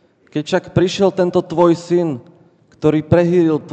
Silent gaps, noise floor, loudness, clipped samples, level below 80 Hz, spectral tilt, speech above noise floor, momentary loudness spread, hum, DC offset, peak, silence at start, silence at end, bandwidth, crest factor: none; -50 dBFS; -16 LUFS; under 0.1%; -48 dBFS; -7 dB/octave; 35 dB; 9 LU; none; under 0.1%; -2 dBFS; 0.35 s; 0 s; 8.6 kHz; 14 dB